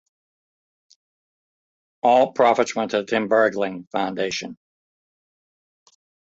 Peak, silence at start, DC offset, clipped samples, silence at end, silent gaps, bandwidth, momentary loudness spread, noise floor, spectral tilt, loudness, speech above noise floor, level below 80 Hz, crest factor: -4 dBFS; 2.05 s; under 0.1%; under 0.1%; 1.8 s; 3.87-3.91 s; 8 kHz; 9 LU; under -90 dBFS; -4 dB/octave; -21 LUFS; over 70 dB; -68 dBFS; 20 dB